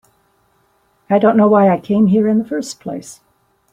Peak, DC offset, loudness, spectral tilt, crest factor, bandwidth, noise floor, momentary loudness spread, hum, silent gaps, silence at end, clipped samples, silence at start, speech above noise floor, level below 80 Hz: -2 dBFS; under 0.1%; -14 LUFS; -7.5 dB/octave; 14 dB; 11 kHz; -59 dBFS; 16 LU; none; none; 0.6 s; under 0.1%; 1.1 s; 46 dB; -58 dBFS